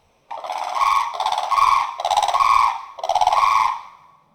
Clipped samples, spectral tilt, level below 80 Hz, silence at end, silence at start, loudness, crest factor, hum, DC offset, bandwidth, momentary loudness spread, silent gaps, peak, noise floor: under 0.1%; 0 dB/octave; -52 dBFS; 0.45 s; 0.3 s; -19 LUFS; 18 dB; none; under 0.1%; over 20 kHz; 12 LU; none; -2 dBFS; -47 dBFS